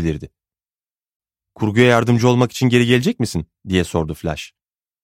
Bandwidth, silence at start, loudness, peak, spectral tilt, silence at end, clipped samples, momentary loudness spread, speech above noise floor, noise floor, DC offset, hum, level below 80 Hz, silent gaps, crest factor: 15.5 kHz; 0 s; -17 LUFS; 0 dBFS; -6 dB/octave; 0.6 s; under 0.1%; 13 LU; over 73 dB; under -90 dBFS; under 0.1%; none; -42 dBFS; 1.15-1.20 s; 18 dB